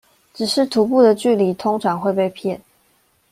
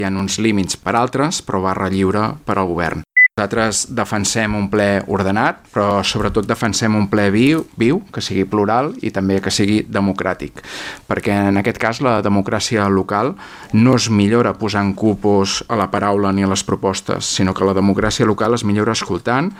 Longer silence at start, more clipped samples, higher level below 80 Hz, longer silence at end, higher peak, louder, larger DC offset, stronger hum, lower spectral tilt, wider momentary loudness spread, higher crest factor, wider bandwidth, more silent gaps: first, 0.4 s vs 0 s; neither; second, -62 dBFS vs -44 dBFS; first, 0.75 s vs 0 s; about the same, -2 dBFS vs -2 dBFS; about the same, -18 LUFS vs -17 LUFS; neither; neither; about the same, -5.5 dB/octave vs -5 dB/octave; first, 12 LU vs 6 LU; about the same, 16 dB vs 16 dB; about the same, 16 kHz vs 15 kHz; neither